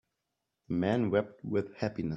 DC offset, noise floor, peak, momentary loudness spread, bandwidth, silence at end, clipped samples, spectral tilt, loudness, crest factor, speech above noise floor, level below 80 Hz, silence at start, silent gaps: under 0.1%; -85 dBFS; -12 dBFS; 7 LU; 8 kHz; 0 s; under 0.1%; -8.5 dB/octave; -32 LUFS; 20 dB; 54 dB; -66 dBFS; 0.7 s; none